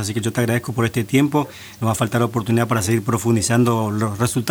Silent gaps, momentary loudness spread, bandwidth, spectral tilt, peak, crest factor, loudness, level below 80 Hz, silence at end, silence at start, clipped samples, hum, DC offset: none; 5 LU; over 20 kHz; -5.5 dB/octave; -2 dBFS; 18 dB; -19 LUFS; -50 dBFS; 0 s; 0 s; under 0.1%; none; under 0.1%